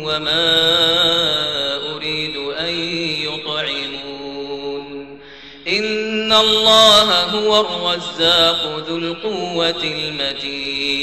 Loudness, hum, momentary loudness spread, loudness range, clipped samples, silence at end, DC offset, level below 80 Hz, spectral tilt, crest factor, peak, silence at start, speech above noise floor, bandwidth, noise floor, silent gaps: -15 LUFS; none; 16 LU; 10 LU; under 0.1%; 0 s; 0.3%; -50 dBFS; -2.5 dB/octave; 16 dB; -2 dBFS; 0 s; 23 dB; 13 kHz; -39 dBFS; none